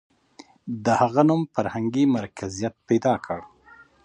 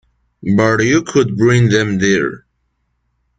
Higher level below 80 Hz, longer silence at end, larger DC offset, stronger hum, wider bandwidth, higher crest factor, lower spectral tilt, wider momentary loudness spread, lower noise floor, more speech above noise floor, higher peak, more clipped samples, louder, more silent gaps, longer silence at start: second, -58 dBFS vs -46 dBFS; second, 0.6 s vs 1 s; neither; neither; about the same, 10 kHz vs 9.2 kHz; first, 20 dB vs 14 dB; about the same, -6.5 dB/octave vs -6 dB/octave; first, 14 LU vs 5 LU; second, -52 dBFS vs -66 dBFS; second, 30 dB vs 53 dB; about the same, -4 dBFS vs -2 dBFS; neither; second, -23 LUFS vs -14 LUFS; neither; first, 0.65 s vs 0.45 s